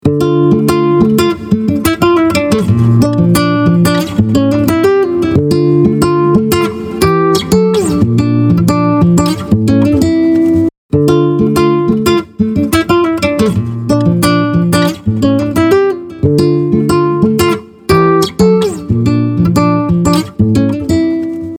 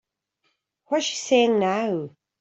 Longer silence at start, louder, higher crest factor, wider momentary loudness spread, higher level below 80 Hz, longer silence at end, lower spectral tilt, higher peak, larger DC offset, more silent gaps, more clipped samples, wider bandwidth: second, 0.05 s vs 0.9 s; first, -11 LUFS vs -23 LUFS; second, 10 dB vs 18 dB; second, 4 LU vs 10 LU; first, -36 dBFS vs -72 dBFS; second, 0 s vs 0.35 s; first, -7 dB/octave vs -4 dB/octave; first, 0 dBFS vs -6 dBFS; neither; first, 10.78-10.89 s vs none; neither; first, 19 kHz vs 8.2 kHz